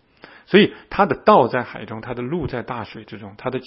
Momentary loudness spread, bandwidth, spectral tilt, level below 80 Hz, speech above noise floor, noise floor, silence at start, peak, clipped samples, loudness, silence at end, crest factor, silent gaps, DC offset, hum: 18 LU; 5.8 kHz; -11 dB/octave; -50 dBFS; 27 dB; -47 dBFS; 0.5 s; 0 dBFS; under 0.1%; -19 LUFS; 0 s; 20 dB; none; under 0.1%; none